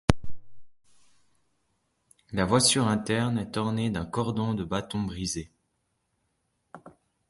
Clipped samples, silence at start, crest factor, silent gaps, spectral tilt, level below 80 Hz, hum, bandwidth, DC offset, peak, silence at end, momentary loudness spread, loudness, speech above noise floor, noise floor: under 0.1%; 0.1 s; 28 dB; none; -4.5 dB/octave; -46 dBFS; none; 12 kHz; under 0.1%; 0 dBFS; 0.4 s; 12 LU; -27 LUFS; 49 dB; -76 dBFS